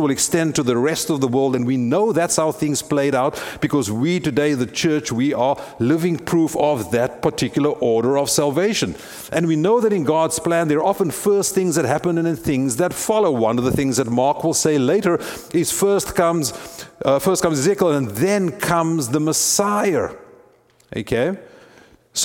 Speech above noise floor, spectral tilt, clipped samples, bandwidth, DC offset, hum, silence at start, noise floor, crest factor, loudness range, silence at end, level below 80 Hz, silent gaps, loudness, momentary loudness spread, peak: 35 dB; -4.5 dB/octave; under 0.1%; 18.5 kHz; under 0.1%; none; 0 s; -54 dBFS; 16 dB; 1 LU; 0 s; -50 dBFS; none; -19 LUFS; 5 LU; -2 dBFS